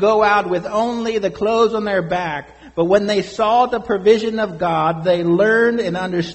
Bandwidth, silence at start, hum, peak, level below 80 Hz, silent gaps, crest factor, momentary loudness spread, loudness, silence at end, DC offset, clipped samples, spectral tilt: 8.4 kHz; 0 s; none; -2 dBFS; -50 dBFS; none; 16 dB; 7 LU; -17 LUFS; 0 s; under 0.1%; under 0.1%; -6 dB/octave